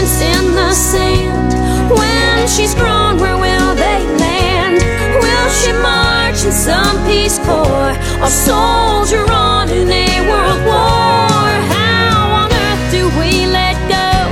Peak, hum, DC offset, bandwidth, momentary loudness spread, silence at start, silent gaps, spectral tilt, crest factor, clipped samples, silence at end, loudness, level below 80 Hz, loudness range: 0 dBFS; none; under 0.1%; 16.5 kHz; 3 LU; 0 s; none; -4 dB/octave; 12 dB; under 0.1%; 0 s; -11 LUFS; -20 dBFS; 1 LU